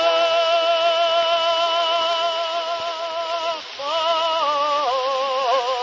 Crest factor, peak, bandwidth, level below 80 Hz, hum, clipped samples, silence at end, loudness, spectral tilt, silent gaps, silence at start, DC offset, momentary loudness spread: 14 dB; -6 dBFS; 7.6 kHz; -68 dBFS; none; under 0.1%; 0 s; -20 LUFS; 0 dB/octave; none; 0 s; under 0.1%; 7 LU